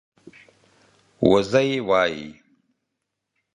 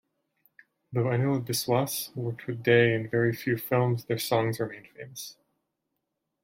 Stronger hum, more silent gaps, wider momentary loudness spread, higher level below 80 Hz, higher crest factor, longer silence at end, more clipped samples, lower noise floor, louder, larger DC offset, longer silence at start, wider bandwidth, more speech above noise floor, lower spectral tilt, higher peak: neither; neither; second, 14 LU vs 17 LU; first, -56 dBFS vs -68 dBFS; about the same, 24 dB vs 20 dB; first, 1.25 s vs 1.1 s; neither; about the same, -80 dBFS vs -82 dBFS; first, -20 LUFS vs -27 LUFS; neither; first, 1.2 s vs 0.9 s; second, 10.5 kHz vs 16.5 kHz; first, 61 dB vs 55 dB; about the same, -5.5 dB/octave vs -5.5 dB/octave; first, -2 dBFS vs -8 dBFS